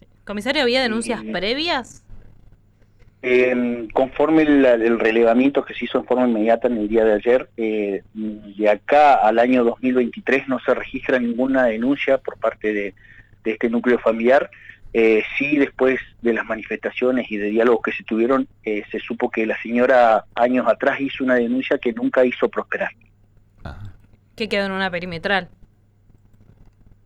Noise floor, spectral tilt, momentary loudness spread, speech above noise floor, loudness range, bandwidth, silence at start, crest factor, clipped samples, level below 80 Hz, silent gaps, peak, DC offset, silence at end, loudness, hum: -54 dBFS; -5.5 dB/octave; 10 LU; 35 dB; 6 LU; 11 kHz; 0.25 s; 14 dB; under 0.1%; -50 dBFS; none; -6 dBFS; under 0.1%; 1.6 s; -19 LUFS; none